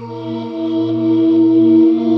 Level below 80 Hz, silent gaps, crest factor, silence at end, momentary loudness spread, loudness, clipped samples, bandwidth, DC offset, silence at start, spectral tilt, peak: -66 dBFS; none; 10 dB; 0 s; 13 LU; -13 LUFS; under 0.1%; 5 kHz; under 0.1%; 0 s; -10 dB/octave; -2 dBFS